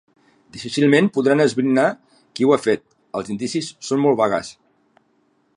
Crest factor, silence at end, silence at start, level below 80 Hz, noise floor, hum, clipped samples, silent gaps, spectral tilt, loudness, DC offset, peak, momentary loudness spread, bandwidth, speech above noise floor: 18 dB; 1.05 s; 0.55 s; -64 dBFS; -63 dBFS; none; under 0.1%; none; -5.5 dB/octave; -19 LUFS; under 0.1%; -2 dBFS; 17 LU; 11 kHz; 45 dB